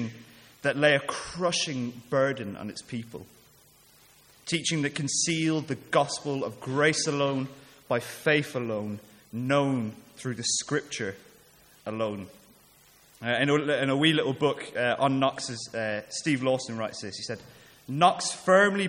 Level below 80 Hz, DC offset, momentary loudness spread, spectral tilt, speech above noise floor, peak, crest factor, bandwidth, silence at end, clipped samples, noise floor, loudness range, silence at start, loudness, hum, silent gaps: -66 dBFS; under 0.1%; 15 LU; -4 dB/octave; 31 dB; -6 dBFS; 22 dB; 17 kHz; 0 s; under 0.1%; -58 dBFS; 5 LU; 0 s; -27 LUFS; none; none